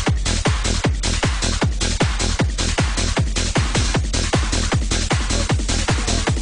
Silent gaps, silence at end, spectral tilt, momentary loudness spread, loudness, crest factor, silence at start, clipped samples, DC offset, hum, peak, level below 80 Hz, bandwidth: none; 0 s; -4 dB/octave; 1 LU; -20 LUFS; 14 dB; 0 s; under 0.1%; under 0.1%; none; -4 dBFS; -22 dBFS; 10.5 kHz